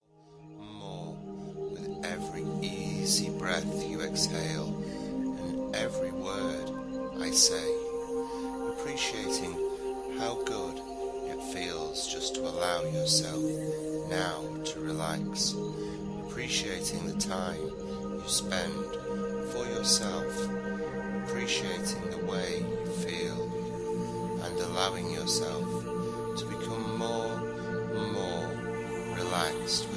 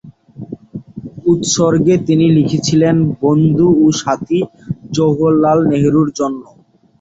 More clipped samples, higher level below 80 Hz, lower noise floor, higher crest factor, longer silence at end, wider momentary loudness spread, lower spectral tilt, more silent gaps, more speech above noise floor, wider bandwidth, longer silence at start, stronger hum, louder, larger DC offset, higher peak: neither; second, -56 dBFS vs -46 dBFS; first, -54 dBFS vs -33 dBFS; first, 22 dB vs 12 dB; second, 0 s vs 0.6 s; second, 9 LU vs 18 LU; second, -3.5 dB/octave vs -6.5 dB/octave; neither; about the same, 22 dB vs 21 dB; first, 11 kHz vs 8 kHz; first, 0.2 s vs 0.05 s; neither; second, -32 LUFS vs -13 LUFS; neither; second, -10 dBFS vs -2 dBFS